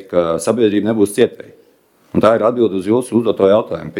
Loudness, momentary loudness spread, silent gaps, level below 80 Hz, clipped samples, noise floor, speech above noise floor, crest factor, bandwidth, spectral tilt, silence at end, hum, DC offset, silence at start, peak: -15 LUFS; 4 LU; none; -54 dBFS; under 0.1%; -53 dBFS; 39 dB; 16 dB; 16 kHz; -6 dB/octave; 0 s; none; under 0.1%; 0 s; 0 dBFS